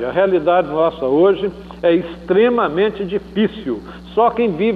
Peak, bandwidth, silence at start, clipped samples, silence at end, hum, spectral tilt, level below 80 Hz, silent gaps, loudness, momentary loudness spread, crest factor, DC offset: -2 dBFS; 5.2 kHz; 0 s; under 0.1%; 0 s; none; -8.5 dB/octave; -46 dBFS; none; -17 LUFS; 9 LU; 14 dB; under 0.1%